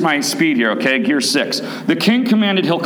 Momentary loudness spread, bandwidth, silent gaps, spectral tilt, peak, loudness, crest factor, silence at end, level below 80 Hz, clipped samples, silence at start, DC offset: 5 LU; over 20 kHz; none; -4 dB/octave; -2 dBFS; -15 LUFS; 14 dB; 0 s; -70 dBFS; under 0.1%; 0 s; under 0.1%